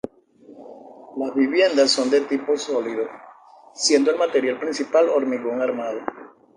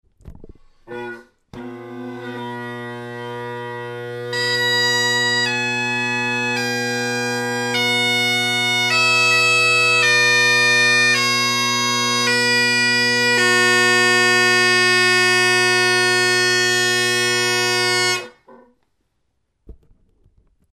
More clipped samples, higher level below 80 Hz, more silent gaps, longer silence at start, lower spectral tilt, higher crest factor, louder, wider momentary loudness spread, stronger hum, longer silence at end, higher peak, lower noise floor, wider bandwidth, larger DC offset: neither; second, -70 dBFS vs -56 dBFS; neither; first, 0.5 s vs 0.25 s; about the same, -2 dB/octave vs -2 dB/octave; about the same, 18 dB vs 16 dB; second, -21 LUFS vs -15 LUFS; second, 14 LU vs 17 LU; neither; second, 0.3 s vs 1 s; about the same, -4 dBFS vs -4 dBFS; second, -49 dBFS vs -71 dBFS; second, 10 kHz vs 15.5 kHz; neither